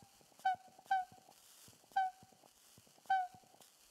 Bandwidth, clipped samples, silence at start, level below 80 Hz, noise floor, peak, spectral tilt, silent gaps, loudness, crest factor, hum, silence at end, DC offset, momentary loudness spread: 15.5 kHz; under 0.1%; 0.45 s; -88 dBFS; -66 dBFS; -26 dBFS; -1.5 dB/octave; none; -40 LUFS; 18 dB; none; 0.6 s; under 0.1%; 24 LU